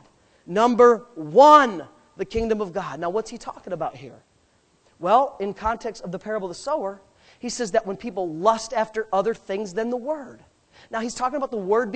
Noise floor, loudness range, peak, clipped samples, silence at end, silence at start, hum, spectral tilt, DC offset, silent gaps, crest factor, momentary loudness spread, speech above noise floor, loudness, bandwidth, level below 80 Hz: -62 dBFS; 8 LU; -2 dBFS; under 0.1%; 0 s; 0.5 s; none; -4.5 dB/octave; under 0.1%; none; 22 dB; 17 LU; 40 dB; -22 LUFS; 9 kHz; -52 dBFS